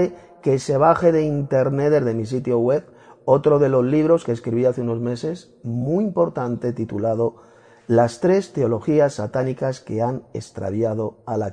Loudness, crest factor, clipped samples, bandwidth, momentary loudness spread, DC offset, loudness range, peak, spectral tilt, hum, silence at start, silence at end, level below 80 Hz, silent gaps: -21 LUFS; 18 dB; under 0.1%; 10 kHz; 10 LU; under 0.1%; 4 LU; -2 dBFS; -8 dB/octave; none; 0 s; 0 s; -56 dBFS; none